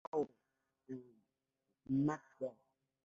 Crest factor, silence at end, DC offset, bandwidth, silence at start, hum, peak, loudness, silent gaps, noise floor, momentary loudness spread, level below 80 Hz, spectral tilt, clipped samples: 18 dB; 0.55 s; under 0.1%; 7.6 kHz; 0.15 s; none; -26 dBFS; -42 LUFS; none; -88 dBFS; 15 LU; -78 dBFS; -9 dB/octave; under 0.1%